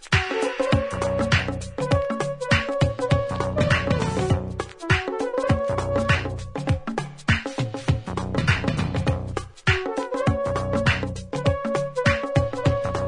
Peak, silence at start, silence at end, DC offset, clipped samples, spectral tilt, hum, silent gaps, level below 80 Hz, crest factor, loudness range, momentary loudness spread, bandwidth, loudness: -4 dBFS; 0 s; 0 s; under 0.1%; under 0.1%; -6 dB/octave; none; none; -40 dBFS; 18 dB; 2 LU; 6 LU; 11 kHz; -24 LUFS